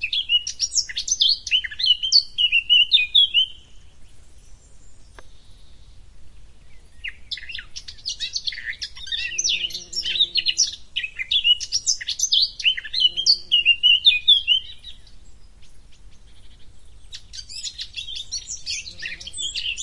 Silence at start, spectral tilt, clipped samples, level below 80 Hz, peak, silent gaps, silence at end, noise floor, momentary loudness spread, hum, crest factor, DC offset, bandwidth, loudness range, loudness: 0 s; 3 dB/octave; under 0.1%; -50 dBFS; -4 dBFS; none; 0 s; -42 dBFS; 18 LU; none; 20 dB; under 0.1%; 12 kHz; 18 LU; -18 LUFS